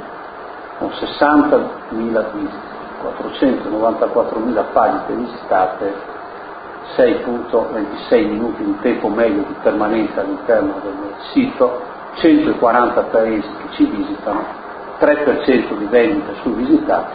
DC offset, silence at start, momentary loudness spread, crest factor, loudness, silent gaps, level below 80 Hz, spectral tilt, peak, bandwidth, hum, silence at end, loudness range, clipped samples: under 0.1%; 0 s; 15 LU; 16 dB; -17 LUFS; none; -48 dBFS; -11 dB/octave; 0 dBFS; 5 kHz; none; 0 s; 3 LU; under 0.1%